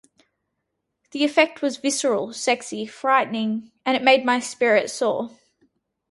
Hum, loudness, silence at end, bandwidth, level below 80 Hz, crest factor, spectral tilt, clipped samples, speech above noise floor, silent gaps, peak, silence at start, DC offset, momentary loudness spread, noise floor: none; -21 LUFS; 0.8 s; 11.5 kHz; -72 dBFS; 20 dB; -2.5 dB/octave; under 0.1%; 57 dB; none; -2 dBFS; 1.15 s; under 0.1%; 10 LU; -78 dBFS